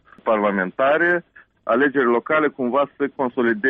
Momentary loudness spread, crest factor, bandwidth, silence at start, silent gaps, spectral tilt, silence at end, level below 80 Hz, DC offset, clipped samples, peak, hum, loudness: 6 LU; 14 dB; 4.6 kHz; 0.25 s; none; -4 dB/octave; 0 s; -64 dBFS; under 0.1%; under 0.1%; -6 dBFS; none; -20 LUFS